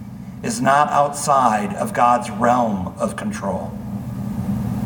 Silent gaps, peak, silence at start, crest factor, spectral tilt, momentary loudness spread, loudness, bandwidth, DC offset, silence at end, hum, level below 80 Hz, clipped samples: none; -2 dBFS; 0 s; 18 dB; -5.5 dB/octave; 12 LU; -20 LUFS; 19 kHz; under 0.1%; 0 s; none; -44 dBFS; under 0.1%